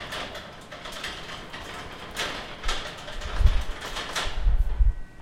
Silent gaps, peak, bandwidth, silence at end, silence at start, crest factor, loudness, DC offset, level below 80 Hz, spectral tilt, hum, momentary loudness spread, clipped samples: none; -6 dBFS; 15 kHz; 0 s; 0 s; 22 dB; -31 LUFS; under 0.1%; -28 dBFS; -3.5 dB/octave; none; 11 LU; under 0.1%